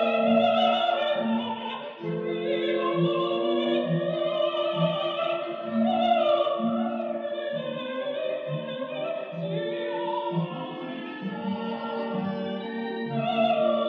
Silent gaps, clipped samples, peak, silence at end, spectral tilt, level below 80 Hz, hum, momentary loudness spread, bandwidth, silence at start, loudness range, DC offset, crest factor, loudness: none; under 0.1%; -10 dBFS; 0 s; -8 dB/octave; -88 dBFS; none; 10 LU; 6.2 kHz; 0 s; 6 LU; under 0.1%; 16 dB; -27 LUFS